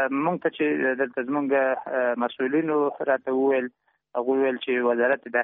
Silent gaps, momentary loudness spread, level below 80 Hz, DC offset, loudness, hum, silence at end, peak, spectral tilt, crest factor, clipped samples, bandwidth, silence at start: none; 4 LU; -74 dBFS; under 0.1%; -24 LUFS; none; 0 s; -10 dBFS; -3.5 dB/octave; 14 dB; under 0.1%; 3.9 kHz; 0 s